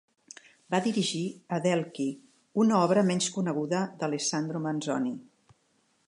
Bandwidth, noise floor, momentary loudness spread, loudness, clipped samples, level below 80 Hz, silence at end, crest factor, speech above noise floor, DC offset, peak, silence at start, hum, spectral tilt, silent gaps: 11 kHz; -70 dBFS; 11 LU; -29 LUFS; under 0.1%; -78 dBFS; 0.85 s; 18 dB; 43 dB; under 0.1%; -10 dBFS; 0.7 s; none; -5 dB/octave; none